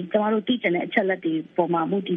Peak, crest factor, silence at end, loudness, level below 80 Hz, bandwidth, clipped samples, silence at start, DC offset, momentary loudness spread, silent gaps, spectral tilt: -6 dBFS; 18 dB; 0 s; -23 LUFS; -72 dBFS; 4.6 kHz; under 0.1%; 0 s; under 0.1%; 3 LU; none; -9 dB/octave